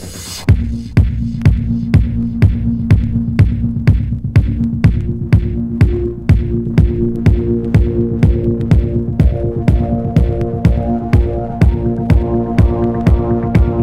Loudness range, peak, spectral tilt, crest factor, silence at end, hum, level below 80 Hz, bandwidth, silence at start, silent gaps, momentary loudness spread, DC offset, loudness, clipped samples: 1 LU; 0 dBFS; -8.5 dB/octave; 12 dB; 0 s; none; -18 dBFS; 11.5 kHz; 0 s; none; 3 LU; under 0.1%; -14 LUFS; 0.4%